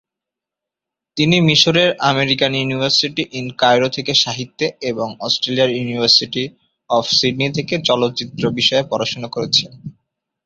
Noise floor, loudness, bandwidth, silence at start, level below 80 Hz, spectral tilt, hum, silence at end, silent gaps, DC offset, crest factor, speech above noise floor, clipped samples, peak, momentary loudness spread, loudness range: -85 dBFS; -16 LUFS; 7.8 kHz; 1.15 s; -54 dBFS; -4 dB/octave; none; 0.55 s; none; under 0.1%; 18 dB; 68 dB; under 0.1%; 0 dBFS; 11 LU; 3 LU